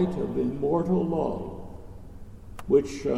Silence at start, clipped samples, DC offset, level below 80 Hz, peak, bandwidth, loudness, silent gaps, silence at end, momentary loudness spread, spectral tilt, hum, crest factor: 0 s; under 0.1%; under 0.1%; -46 dBFS; -10 dBFS; 12 kHz; -26 LUFS; none; 0 s; 22 LU; -8 dB/octave; none; 18 dB